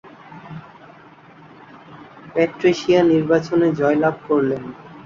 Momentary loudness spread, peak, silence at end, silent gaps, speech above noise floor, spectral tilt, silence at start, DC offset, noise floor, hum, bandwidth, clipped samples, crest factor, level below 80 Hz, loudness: 22 LU; -4 dBFS; 0.05 s; none; 28 dB; -7 dB/octave; 0.05 s; under 0.1%; -45 dBFS; none; 7.4 kHz; under 0.1%; 16 dB; -58 dBFS; -18 LUFS